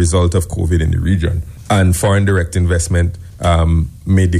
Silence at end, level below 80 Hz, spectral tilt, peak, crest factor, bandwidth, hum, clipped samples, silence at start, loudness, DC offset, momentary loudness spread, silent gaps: 0 s; -24 dBFS; -6 dB/octave; -4 dBFS; 10 dB; 14.5 kHz; none; under 0.1%; 0 s; -15 LUFS; under 0.1%; 5 LU; none